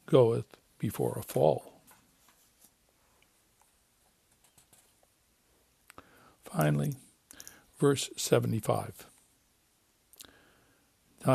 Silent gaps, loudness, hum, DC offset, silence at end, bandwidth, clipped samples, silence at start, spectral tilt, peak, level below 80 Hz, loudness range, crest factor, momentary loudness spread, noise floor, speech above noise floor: none; -30 LUFS; none; under 0.1%; 0 s; 15 kHz; under 0.1%; 0.1 s; -6 dB/octave; -8 dBFS; -68 dBFS; 6 LU; 26 dB; 25 LU; -70 dBFS; 42 dB